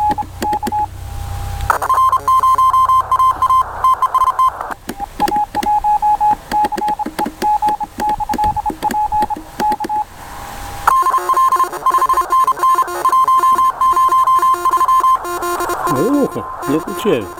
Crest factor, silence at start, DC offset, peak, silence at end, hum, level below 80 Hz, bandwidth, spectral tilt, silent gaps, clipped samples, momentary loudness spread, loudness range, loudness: 14 dB; 0 s; under 0.1%; 0 dBFS; 0 s; none; -36 dBFS; 17.5 kHz; -4.5 dB/octave; none; under 0.1%; 10 LU; 5 LU; -15 LUFS